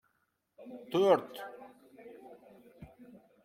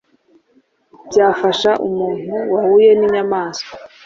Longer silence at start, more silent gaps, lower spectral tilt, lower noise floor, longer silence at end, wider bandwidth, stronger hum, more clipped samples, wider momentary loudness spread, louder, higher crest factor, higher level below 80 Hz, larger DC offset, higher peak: second, 0.6 s vs 1.05 s; neither; first, -6 dB/octave vs -4.5 dB/octave; first, -79 dBFS vs -57 dBFS; first, 1.35 s vs 0.2 s; first, 16 kHz vs 7.6 kHz; neither; neither; first, 28 LU vs 12 LU; second, -30 LUFS vs -15 LUFS; first, 24 dB vs 14 dB; second, -74 dBFS vs -58 dBFS; neither; second, -12 dBFS vs -2 dBFS